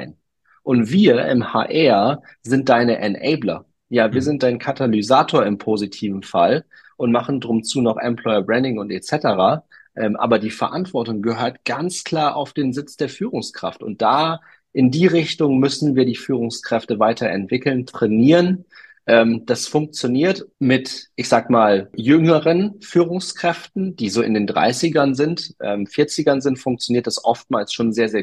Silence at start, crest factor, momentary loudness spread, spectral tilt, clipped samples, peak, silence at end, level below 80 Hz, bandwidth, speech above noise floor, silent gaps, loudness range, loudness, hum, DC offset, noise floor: 0 s; 16 dB; 10 LU; -5.5 dB/octave; under 0.1%; -2 dBFS; 0 s; -60 dBFS; 12.5 kHz; 42 dB; none; 4 LU; -19 LUFS; none; under 0.1%; -60 dBFS